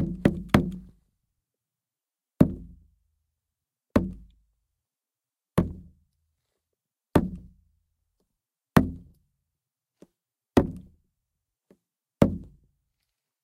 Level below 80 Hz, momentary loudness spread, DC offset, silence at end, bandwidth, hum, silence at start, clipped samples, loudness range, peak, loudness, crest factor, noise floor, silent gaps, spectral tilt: -46 dBFS; 21 LU; under 0.1%; 1 s; 16 kHz; none; 0 s; under 0.1%; 4 LU; -2 dBFS; -26 LUFS; 28 dB; under -90 dBFS; none; -7.5 dB/octave